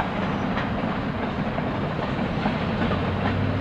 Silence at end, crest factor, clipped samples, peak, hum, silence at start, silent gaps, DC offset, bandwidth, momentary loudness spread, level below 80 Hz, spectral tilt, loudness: 0 s; 16 dB; under 0.1%; -8 dBFS; none; 0 s; none; under 0.1%; 8.2 kHz; 2 LU; -40 dBFS; -8 dB/octave; -26 LUFS